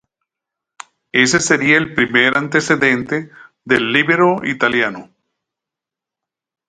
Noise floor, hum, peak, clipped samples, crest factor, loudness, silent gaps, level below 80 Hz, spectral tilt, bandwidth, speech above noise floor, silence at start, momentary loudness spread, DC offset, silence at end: -86 dBFS; none; 0 dBFS; under 0.1%; 18 dB; -14 LUFS; none; -56 dBFS; -3.5 dB/octave; 9.6 kHz; 70 dB; 1.15 s; 7 LU; under 0.1%; 1.65 s